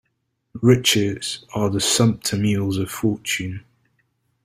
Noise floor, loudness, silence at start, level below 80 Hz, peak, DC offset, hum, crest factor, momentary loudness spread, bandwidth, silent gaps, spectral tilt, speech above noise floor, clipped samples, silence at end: -73 dBFS; -20 LUFS; 0.55 s; -54 dBFS; -2 dBFS; under 0.1%; none; 20 dB; 11 LU; 16 kHz; none; -4.5 dB/octave; 53 dB; under 0.1%; 0.85 s